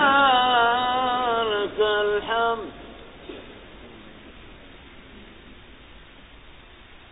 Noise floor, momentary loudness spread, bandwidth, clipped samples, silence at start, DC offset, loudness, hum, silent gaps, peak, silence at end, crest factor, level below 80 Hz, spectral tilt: -47 dBFS; 27 LU; 4 kHz; under 0.1%; 0 s; under 0.1%; -21 LUFS; none; none; -6 dBFS; 0.15 s; 18 dB; -52 dBFS; -7.5 dB/octave